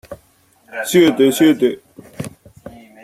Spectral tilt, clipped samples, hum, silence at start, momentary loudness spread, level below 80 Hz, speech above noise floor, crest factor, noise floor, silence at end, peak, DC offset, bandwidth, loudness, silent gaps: -4.5 dB/octave; under 0.1%; none; 0.1 s; 19 LU; -56 dBFS; 41 dB; 16 dB; -55 dBFS; 0.35 s; -2 dBFS; under 0.1%; 15.5 kHz; -14 LUFS; none